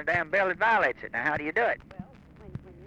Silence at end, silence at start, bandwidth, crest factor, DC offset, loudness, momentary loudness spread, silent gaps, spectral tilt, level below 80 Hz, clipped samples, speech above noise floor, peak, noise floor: 0 s; 0 s; 9.8 kHz; 16 dB; under 0.1%; -26 LUFS; 21 LU; none; -6 dB/octave; -56 dBFS; under 0.1%; 22 dB; -12 dBFS; -49 dBFS